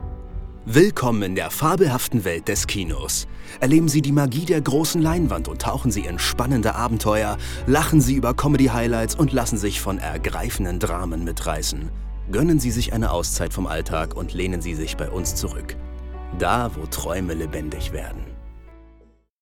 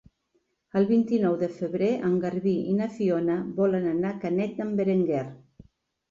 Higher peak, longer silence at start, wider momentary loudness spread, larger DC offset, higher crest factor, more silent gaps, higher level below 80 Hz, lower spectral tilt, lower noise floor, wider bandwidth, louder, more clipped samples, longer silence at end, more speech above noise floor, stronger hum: first, -2 dBFS vs -12 dBFS; second, 0 s vs 0.75 s; first, 13 LU vs 5 LU; neither; first, 20 dB vs 14 dB; neither; first, -30 dBFS vs -66 dBFS; second, -5 dB/octave vs -9 dB/octave; second, -53 dBFS vs -73 dBFS; first, 19 kHz vs 7.4 kHz; first, -22 LUFS vs -26 LUFS; neither; second, 0.55 s vs 0.75 s; second, 32 dB vs 48 dB; neither